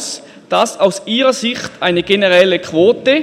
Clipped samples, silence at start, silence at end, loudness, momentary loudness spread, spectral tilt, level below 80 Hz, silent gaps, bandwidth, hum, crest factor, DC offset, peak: under 0.1%; 0 s; 0 s; -13 LUFS; 8 LU; -3.5 dB/octave; -54 dBFS; none; 14 kHz; none; 14 dB; under 0.1%; 0 dBFS